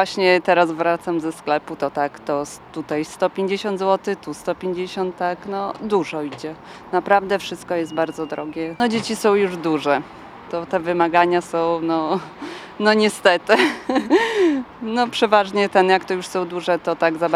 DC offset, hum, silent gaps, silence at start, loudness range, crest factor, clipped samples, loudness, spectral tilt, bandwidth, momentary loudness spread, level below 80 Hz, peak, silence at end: under 0.1%; none; none; 0 s; 6 LU; 20 dB; under 0.1%; -20 LUFS; -4.5 dB/octave; 15 kHz; 11 LU; -60 dBFS; 0 dBFS; 0 s